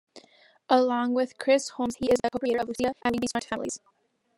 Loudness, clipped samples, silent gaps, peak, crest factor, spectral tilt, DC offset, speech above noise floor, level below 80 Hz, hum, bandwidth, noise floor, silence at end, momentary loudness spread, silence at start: -27 LUFS; under 0.1%; none; -6 dBFS; 20 dB; -4 dB/octave; under 0.1%; 33 dB; -62 dBFS; none; 12.5 kHz; -59 dBFS; 0.6 s; 9 LU; 0.15 s